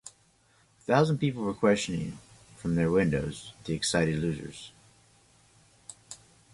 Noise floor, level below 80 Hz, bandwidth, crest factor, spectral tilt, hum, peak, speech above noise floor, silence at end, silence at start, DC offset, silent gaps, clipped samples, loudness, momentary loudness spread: -65 dBFS; -54 dBFS; 11.5 kHz; 22 dB; -5.5 dB/octave; none; -8 dBFS; 37 dB; 0.4 s; 0.05 s; under 0.1%; none; under 0.1%; -28 LUFS; 23 LU